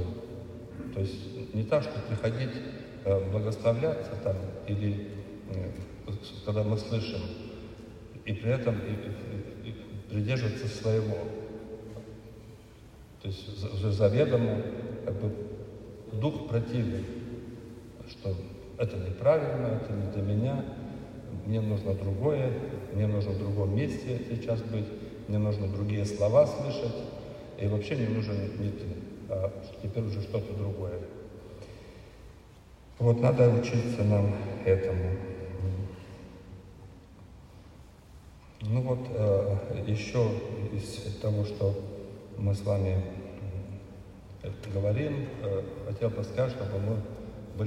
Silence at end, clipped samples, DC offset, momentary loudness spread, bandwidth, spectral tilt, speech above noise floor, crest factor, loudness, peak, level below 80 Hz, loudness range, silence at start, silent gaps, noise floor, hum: 0 s; under 0.1%; under 0.1%; 18 LU; 11 kHz; -8 dB/octave; 23 dB; 22 dB; -31 LUFS; -10 dBFS; -54 dBFS; 6 LU; 0 s; none; -52 dBFS; none